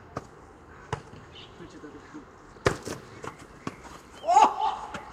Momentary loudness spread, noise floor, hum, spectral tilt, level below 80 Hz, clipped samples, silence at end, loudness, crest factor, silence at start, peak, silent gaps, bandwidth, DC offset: 25 LU; -49 dBFS; none; -4.5 dB/octave; -54 dBFS; under 0.1%; 0 s; -27 LUFS; 24 dB; 0.15 s; -6 dBFS; none; 14.5 kHz; under 0.1%